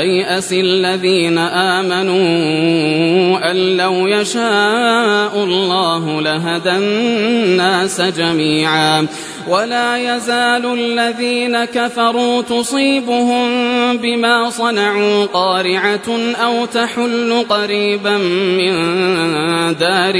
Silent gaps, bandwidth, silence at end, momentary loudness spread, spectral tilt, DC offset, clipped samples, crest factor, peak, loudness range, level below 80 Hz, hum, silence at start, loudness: none; 11 kHz; 0 s; 4 LU; -4 dB/octave; under 0.1%; under 0.1%; 14 dB; -2 dBFS; 2 LU; -60 dBFS; none; 0 s; -14 LUFS